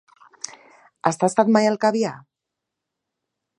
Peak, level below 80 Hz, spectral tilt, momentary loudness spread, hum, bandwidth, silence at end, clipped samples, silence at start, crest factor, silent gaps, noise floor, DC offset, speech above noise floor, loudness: 0 dBFS; -74 dBFS; -5 dB/octave; 19 LU; none; 10.5 kHz; 1.4 s; under 0.1%; 0.5 s; 22 dB; none; -83 dBFS; under 0.1%; 65 dB; -20 LUFS